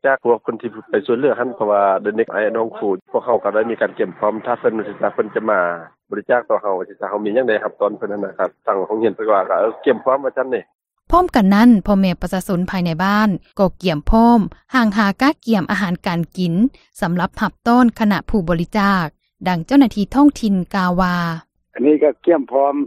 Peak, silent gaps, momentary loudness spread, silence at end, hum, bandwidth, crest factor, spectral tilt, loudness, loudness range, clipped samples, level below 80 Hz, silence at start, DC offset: 0 dBFS; 3.02-3.06 s, 10.75-10.79 s; 8 LU; 0 s; none; 15 kHz; 16 dB; -7 dB/octave; -17 LUFS; 4 LU; under 0.1%; -36 dBFS; 0.05 s; under 0.1%